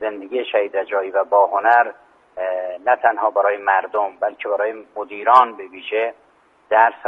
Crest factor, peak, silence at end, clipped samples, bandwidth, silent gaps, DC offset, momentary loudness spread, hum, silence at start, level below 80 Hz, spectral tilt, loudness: 18 dB; 0 dBFS; 0 s; under 0.1%; 5.6 kHz; none; under 0.1%; 11 LU; none; 0 s; -72 dBFS; -4 dB/octave; -19 LUFS